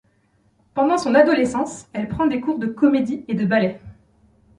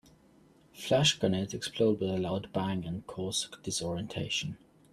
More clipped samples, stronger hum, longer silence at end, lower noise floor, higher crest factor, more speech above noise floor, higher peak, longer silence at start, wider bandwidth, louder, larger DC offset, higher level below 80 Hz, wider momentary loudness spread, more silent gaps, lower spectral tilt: neither; neither; first, 0.65 s vs 0.35 s; about the same, -61 dBFS vs -61 dBFS; about the same, 18 dB vs 20 dB; first, 43 dB vs 30 dB; first, -2 dBFS vs -12 dBFS; about the same, 0.75 s vs 0.75 s; second, 11.5 kHz vs 13.5 kHz; first, -20 LUFS vs -31 LUFS; neither; first, -52 dBFS vs -62 dBFS; about the same, 12 LU vs 12 LU; neither; first, -6 dB/octave vs -4 dB/octave